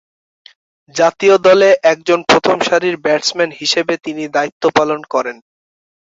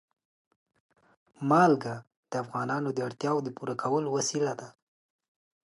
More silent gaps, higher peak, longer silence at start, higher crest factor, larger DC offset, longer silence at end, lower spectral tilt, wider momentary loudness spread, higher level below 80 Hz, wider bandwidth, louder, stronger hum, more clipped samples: about the same, 4.52-4.60 s vs 2.17-2.23 s; first, 0 dBFS vs -10 dBFS; second, 0.95 s vs 1.4 s; second, 14 dB vs 22 dB; neither; second, 0.8 s vs 1.05 s; second, -3.5 dB/octave vs -5 dB/octave; second, 10 LU vs 14 LU; first, -58 dBFS vs -78 dBFS; second, 8 kHz vs 11.5 kHz; first, -13 LUFS vs -29 LUFS; neither; neither